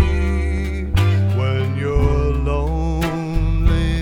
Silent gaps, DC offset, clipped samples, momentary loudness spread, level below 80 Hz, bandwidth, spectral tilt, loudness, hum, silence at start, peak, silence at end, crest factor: none; under 0.1%; under 0.1%; 4 LU; -20 dBFS; 16 kHz; -7.5 dB/octave; -19 LUFS; none; 0 s; -2 dBFS; 0 s; 16 dB